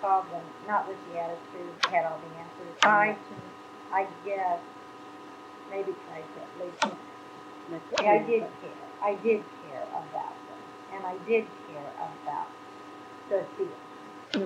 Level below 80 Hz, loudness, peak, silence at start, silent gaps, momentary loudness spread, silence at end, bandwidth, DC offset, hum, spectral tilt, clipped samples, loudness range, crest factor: -82 dBFS; -30 LUFS; -6 dBFS; 0 s; none; 21 LU; 0 s; 11.5 kHz; under 0.1%; none; -3.5 dB/octave; under 0.1%; 7 LU; 26 dB